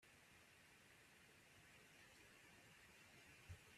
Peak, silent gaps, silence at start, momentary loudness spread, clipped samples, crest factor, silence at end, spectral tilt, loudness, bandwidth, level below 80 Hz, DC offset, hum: -48 dBFS; none; 0 s; 4 LU; under 0.1%; 20 dB; 0 s; -3 dB/octave; -66 LUFS; 14.5 kHz; -82 dBFS; under 0.1%; none